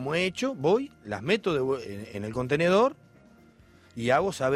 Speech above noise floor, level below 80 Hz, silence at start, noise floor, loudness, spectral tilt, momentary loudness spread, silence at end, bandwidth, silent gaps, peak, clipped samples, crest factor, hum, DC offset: 30 dB; -60 dBFS; 0 s; -56 dBFS; -27 LUFS; -5.5 dB/octave; 12 LU; 0 s; 14 kHz; none; -10 dBFS; under 0.1%; 18 dB; none; under 0.1%